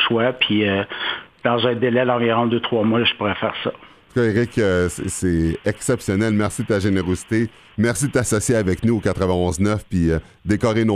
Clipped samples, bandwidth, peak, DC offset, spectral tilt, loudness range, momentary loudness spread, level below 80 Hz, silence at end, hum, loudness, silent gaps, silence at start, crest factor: under 0.1%; 14.5 kHz; -4 dBFS; under 0.1%; -5 dB/octave; 2 LU; 6 LU; -40 dBFS; 0 s; none; -20 LUFS; none; 0 s; 16 dB